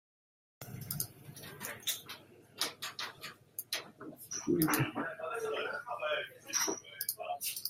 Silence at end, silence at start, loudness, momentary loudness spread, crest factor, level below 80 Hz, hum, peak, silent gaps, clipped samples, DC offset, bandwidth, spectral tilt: 0 s; 0.6 s; -37 LUFS; 17 LU; 26 dB; -72 dBFS; none; -14 dBFS; none; under 0.1%; under 0.1%; 16 kHz; -3 dB/octave